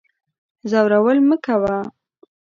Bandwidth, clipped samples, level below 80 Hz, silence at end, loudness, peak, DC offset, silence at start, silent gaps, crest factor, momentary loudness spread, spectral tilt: 7.2 kHz; under 0.1%; -58 dBFS; 0.65 s; -17 LUFS; -2 dBFS; under 0.1%; 0.65 s; none; 16 dB; 15 LU; -7.5 dB/octave